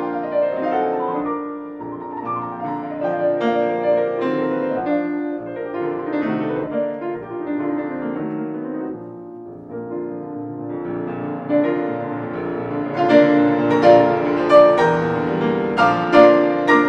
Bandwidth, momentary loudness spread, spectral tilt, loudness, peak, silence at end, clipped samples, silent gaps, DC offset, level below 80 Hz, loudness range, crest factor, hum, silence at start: 8 kHz; 16 LU; -7.5 dB/octave; -19 LUFS; -2 dBFS; 0 s; under 0.1%; none; under 0.1%; -56 dBFS; 12 LU; 18 dB; none; 0 s